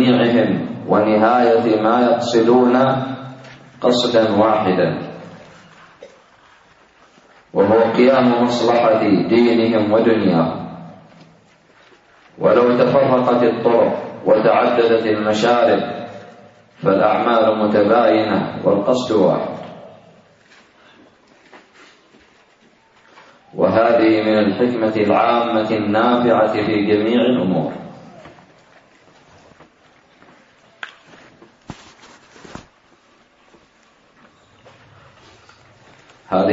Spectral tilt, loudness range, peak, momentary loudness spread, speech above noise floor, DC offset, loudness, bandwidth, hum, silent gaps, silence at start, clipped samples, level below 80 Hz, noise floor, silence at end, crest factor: -6.5 dB/octave; 7 LU; -2 dBFS; 14 LU; 39 dB; under 0.1%; -15 LUFS; 7.8 kHz; none; none; 0 s; under 0.1%; -60 dBFS; -54 dBFS; 0 s; 16 dB